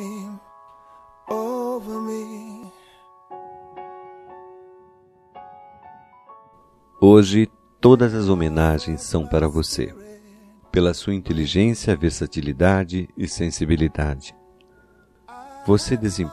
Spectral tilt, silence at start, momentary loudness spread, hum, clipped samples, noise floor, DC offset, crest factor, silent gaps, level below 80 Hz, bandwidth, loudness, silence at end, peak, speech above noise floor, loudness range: -6.5 dB/octave; 0 s; 25 LU; none; under 0.1%; -55 dBFS; under 0.1%; 22 dB; none; -40 dBFS; 14 kHz; -20 LUFS; 0 s; 0 dBFS; 37 dB; 14 LU